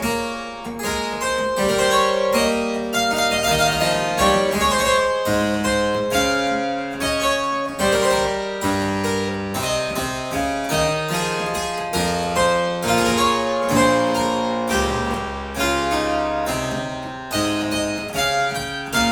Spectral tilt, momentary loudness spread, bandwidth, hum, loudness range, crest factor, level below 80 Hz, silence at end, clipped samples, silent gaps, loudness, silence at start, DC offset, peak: -3.5 dB/octave; 7 LU; 19.5 kHz; none; 4 LU; 16 dB; -40 dBFS; 0 s; under 0.1%; none; -20 LUFS; 0 s; under 0.1%; -4 dBFS